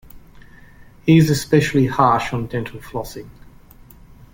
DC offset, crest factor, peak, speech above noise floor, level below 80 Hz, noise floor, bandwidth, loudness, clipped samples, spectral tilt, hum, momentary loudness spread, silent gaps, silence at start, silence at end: under 0.1%; 18 dB; -2 dBFS; 27 dB; -44 dBFS; -44 dBFS; 17 kHz; -18 LUFS; under 0.1%; -6.5 dB/octave; none; 15 LU; none; 0.15 s; 1 s